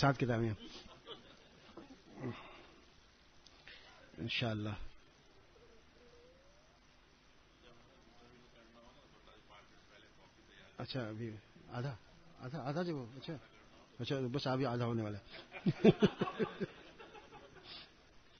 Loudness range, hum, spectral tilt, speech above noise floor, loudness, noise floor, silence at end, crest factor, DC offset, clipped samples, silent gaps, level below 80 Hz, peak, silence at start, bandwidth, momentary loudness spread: 18 LU; none; -5.5 dB/octave; 29 dB; -39 LUFS; -66 dBFS; 0.2 s; 28 dB; under 0.1%; under 0.1%; none; -66 dBFS; -12 dBFS; 0 s; 6.4 kHz; 26 LU